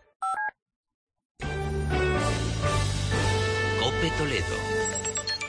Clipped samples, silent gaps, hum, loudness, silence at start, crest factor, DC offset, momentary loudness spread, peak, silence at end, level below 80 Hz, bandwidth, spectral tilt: under 0.1%; 0.62-0.66 s, 0.76-0.84 s, 0.94-1.07 s, 1.25-1.35 s; none; -27 LUFS; 0.2 s; 14 dB; under 0.1%; 6 LU; -14 dBFS; 0 s; -38 dBFS; 10.5 kHz; -4 dB/octave